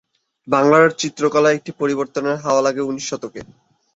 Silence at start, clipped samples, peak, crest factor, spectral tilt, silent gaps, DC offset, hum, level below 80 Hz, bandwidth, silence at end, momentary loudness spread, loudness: 0.45 s; under 0.1%; -2 dBFS; 16 dB; -4.5 dB/octave; none; under 0.1%; none; -62 dBFS; 8 kHz; 0.5 s; 13 LU; -18 LUFS